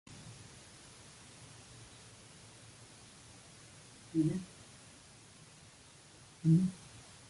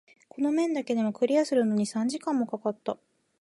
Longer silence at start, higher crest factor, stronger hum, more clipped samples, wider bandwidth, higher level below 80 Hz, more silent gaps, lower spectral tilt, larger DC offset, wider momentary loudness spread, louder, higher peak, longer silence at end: second, 0.1 s vs 0.35 s; first, 22 dB vs 16 dB; neither; neither; about the same, 11.5 kHz vs 11.5 kHz; first, -68 dBFS vs -80 dBFS; neither; first, -7 dB/octave vs -5.5 dB/octave; neither; first, 24 LU vs 8 LU; second, -33 LUFS vs -28 LUFS; second, -18 dBFS vs -12 dBFS; second, 0.3 s vs 0.45 s